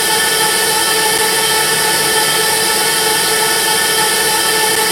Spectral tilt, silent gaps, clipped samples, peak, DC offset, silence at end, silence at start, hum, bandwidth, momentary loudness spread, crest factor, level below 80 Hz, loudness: 0 dB/octave; none; under 0.1%; 0 dBFS; under 0.1%; 0 s; 0 s; none; 16 kHz; 0 LU; 14 dB; -48 dBFS; -11 LUFS